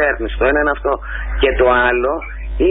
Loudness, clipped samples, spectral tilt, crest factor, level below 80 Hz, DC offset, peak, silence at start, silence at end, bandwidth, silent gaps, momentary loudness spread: -16 LUFS; under 0.1%; -11 dB/octave; 12 dB; -24 dBFS; under 0.1%; -4 dBFS; 0 s; 0 s; 4 kHz; none; 11 LU